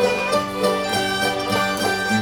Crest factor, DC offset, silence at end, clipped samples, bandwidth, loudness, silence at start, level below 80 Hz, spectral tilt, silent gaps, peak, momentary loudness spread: 16 dB; under 0.1%; 0 s; under 0.1%; over 20 kHz; -20 LUFS; 0 s; -50 dBFS; -3.5 dB/octave; none; -4 dBFS; 1 LU